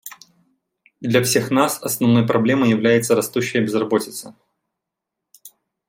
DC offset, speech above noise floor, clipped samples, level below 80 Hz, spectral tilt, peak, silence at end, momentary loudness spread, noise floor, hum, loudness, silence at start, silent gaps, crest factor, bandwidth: under 0.1%; 65 dB; under 0.1%; -62 dBFS; -5 dB/octave; -2 dBFS; 0.4 s; 10 LU; -82 dBFS; none; -18 LUFS; 0.05 s; none; 18 dB; 16.5 kHz